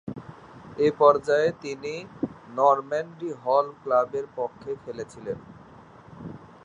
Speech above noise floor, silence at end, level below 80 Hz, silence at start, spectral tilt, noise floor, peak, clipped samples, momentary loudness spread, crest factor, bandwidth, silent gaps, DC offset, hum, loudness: 24 dB; 0.2 s; -62 dBFS; 0.05 s; -6 dB/octave; -49 dBFS; -4 dBFS; under 0.1%; 22 LU; 22 dB; 10 kHz; none; under 0.1%; none; -25 LUFS